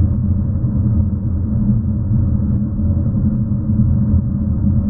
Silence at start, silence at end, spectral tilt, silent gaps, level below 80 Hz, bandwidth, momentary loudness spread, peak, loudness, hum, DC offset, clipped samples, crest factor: 0 s; 0 s; -16.5 dB/octave; none; -24 dBFS; 1.8 kHz; 3 LU; -4 dBFS; -17 LUFS; none; under 0.1%; under 0.1%; 12 dB